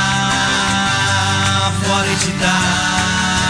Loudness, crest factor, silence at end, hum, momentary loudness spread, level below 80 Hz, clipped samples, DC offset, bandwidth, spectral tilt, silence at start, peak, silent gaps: -15 LUFS; 12 dB; 0 s; none; 1 LU; -38 dBFS; under 0.1%; under 0.1%; 11 kHz; -3 dB/octave; 0 s; -2 dBFS; none